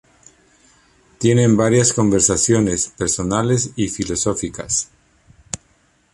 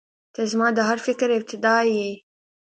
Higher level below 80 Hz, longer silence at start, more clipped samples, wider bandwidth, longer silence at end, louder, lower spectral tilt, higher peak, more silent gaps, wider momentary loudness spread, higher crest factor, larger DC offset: first, -44 dBFS vs -72 dBFS; first, 1.2 s vs 0.4 s; neither; first, 11.5 kHz vs 9 kHz; about the same, 0.55 s vs 0.5 s; first, -17 LUFS vs -22 LUFS; about the same, -4.5 dB/octave vs -4 dB/octave; first, -2 dBFS vs -6 dBFS; neither; first, 15 LU vs 12 LU; about the same, 18 dB vs 18 dB; neither